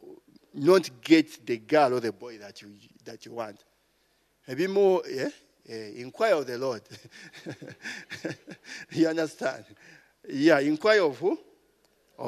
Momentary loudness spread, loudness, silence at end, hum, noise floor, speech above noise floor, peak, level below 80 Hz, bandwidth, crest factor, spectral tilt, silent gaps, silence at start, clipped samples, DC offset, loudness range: 21 LU; -26 LUFS; 0 s; none; -69 dBFS; 42 dB; -6 dBFS; -78 dBFS; 13.5 kHz; 22 dB; -5 dB/octave; none; 0.05 s; under 0.1%; under 0.1%; 7 LU